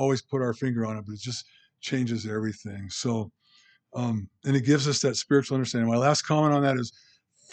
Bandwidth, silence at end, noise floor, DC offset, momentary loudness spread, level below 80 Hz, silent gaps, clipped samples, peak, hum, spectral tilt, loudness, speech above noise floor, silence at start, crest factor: 9.2 kHz; 0.65 s; -62 dBFS; under 0.1%; 13 LU; -70 dBFS; none; under 0.1%; -6 dBFS; none; -5.5 dB/octave; -26 LUFS; 36 dB; 0 s; 20 dB